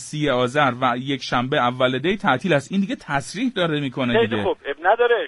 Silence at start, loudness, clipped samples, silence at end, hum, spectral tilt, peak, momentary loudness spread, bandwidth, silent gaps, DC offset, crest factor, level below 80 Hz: 0 s; -21 LUFS; under 0.1%; 0 s; none; -5.5 dB/octave; -4 dBFS; 6 LU; 11.5 kHz; none; under 0.1%; 16 dB; -50 dBFS